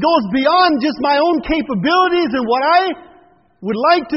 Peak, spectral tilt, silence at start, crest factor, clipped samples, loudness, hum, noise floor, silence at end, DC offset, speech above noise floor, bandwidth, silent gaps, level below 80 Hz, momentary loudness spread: -2 dBFS; -2.5 dB/octave; 0 s; 14 dB; under 0.1%; -15 LUFS; none; -49 dBFS; 0 s; under 0.1%; 35 dB; 6 kHz; none; -44 dBFS; 8 LU